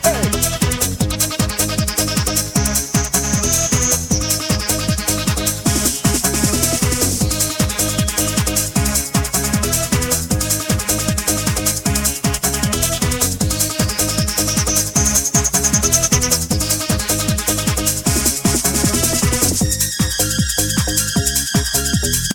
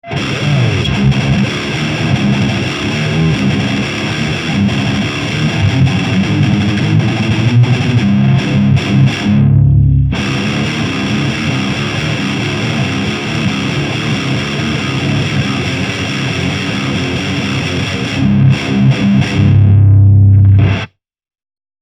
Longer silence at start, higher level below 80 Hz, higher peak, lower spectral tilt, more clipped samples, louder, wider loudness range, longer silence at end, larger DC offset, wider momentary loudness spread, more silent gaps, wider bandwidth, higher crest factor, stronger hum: about the same, 0 s vs 0.05 s; about the same, -28 dBFS vs -30 dBFS; about the same, 0 dBFS vs 0 dBFS; second, -3 dB/octave vs -6.5 dB/octave; neither; second, -16 LUFS vs -12 LUFS; second, 2 LU vs 5 LU; second, 0 s vs 0.95 s; neither; second, 3 LU vs 7 LU; neither; first, 19 kHz vs 10 kHz; first, 18 dB vs 12 dB; neither